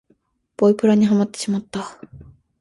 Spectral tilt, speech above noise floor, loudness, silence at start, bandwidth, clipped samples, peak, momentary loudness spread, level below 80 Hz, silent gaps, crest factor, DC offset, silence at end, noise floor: -6.5 dB/octave; 45 dB; -19 LUFS; 0.6 s; 11.5 kHz; under 0.1%; -4 dBFS; 15 LU; -56 dBFS; none; 16 dB; under 0.1%; 0.4 s; -63 dBFS